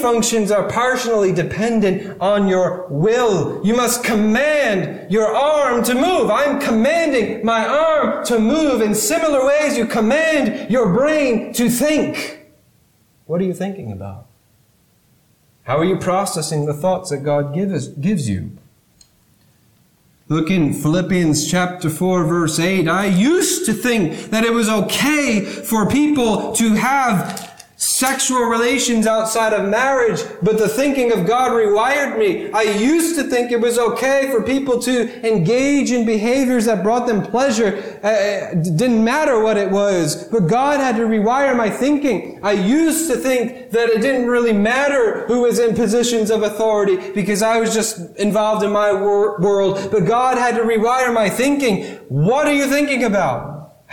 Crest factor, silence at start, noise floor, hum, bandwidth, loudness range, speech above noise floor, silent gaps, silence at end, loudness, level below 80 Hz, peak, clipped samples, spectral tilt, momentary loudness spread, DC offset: 12 dB; 0 s; -57 dBFS; none; 19 kHz; 5 LU; 40 dB; none; 0.25 s; -17 LUFS; -50 dBFS; -6 dBFS; under 0.1%; -4.5 dB/octave; 5 LU; under 0.1%